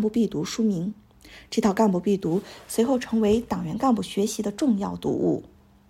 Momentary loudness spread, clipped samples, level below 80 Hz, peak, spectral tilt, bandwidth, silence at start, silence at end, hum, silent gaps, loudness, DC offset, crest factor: 8 LU; under 0.1%; -54 dBFS; -8 dBFS; -6 dB/octave; 15.5 kHz; 0 s; 0.4 s; none; none; -25 LUFS; under 0.1%; 16 dB